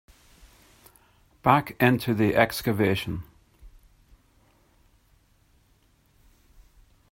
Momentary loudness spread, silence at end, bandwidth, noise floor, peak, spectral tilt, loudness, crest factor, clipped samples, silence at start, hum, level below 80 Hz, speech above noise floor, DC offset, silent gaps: 8 LU; 3.45 s; 16.5 kHz; -63 dBFS; -2 dBFS; -6 dB/octave; -24 LUFS; 26 dB; under 0.1%; 1.45 s; none; -54 dBFS; 40 dB; under 0.1%; none